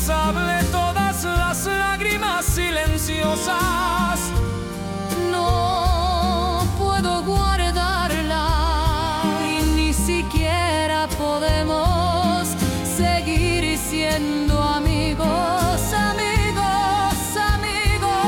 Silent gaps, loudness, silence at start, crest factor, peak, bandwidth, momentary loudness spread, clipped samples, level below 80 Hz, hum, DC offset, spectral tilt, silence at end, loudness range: none; -20 LUFS; 0 s; 12 dB; -8 dBFS; 18 kHz; 2 LU; under 0.1%; -28 dBFS; none; under 0.1%; -4.5 dB/octave; 0 s; 1 LU